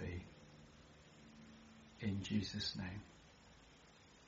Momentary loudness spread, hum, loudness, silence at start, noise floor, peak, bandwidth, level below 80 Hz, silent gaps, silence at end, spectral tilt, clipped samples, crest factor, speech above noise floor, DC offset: 22 LU; none; -44 LUFS; 0 s; -65 dBFS; -26 dBFS; 7.6 kHz; -66 dBFS; none; 0 s; -4.5 dB/octave; under 0.1%; 22 dB; 22 dB; under 0.1%